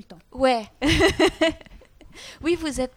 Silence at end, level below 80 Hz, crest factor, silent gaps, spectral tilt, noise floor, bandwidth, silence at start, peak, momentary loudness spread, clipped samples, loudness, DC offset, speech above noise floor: 0.1 s; -40 dBFS; 18 dB; none; -4.5 dB/octave; -47 dBFS; 16 kHz; 0.1 s; -4 dBFS; 23 LU; under 0.1%; -22 LUFS; under 0.1%; 25 dB